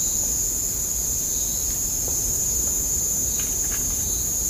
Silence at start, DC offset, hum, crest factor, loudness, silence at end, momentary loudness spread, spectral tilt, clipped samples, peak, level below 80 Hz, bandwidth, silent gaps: 0 s; under 0.1%; none; 14 dB; -21 LUFS; 0 s; 2 LU; -1.5 dB/octave; under 0.1%; -10 dBFS; -36 dBFS; 15.5 kHz; none